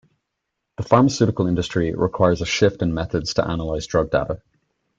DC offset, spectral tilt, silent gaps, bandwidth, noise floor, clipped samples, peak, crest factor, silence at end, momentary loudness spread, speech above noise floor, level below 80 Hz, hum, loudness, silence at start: under 0.1%; -6 dB/octave; none; 9 kHz; -79 dBFS; under 0.1%; -2 dBFS; 20 dB; 0.65 s; 9 LU; 59 dB; -42 dBFS; none; -20 LUFS; 0.8 s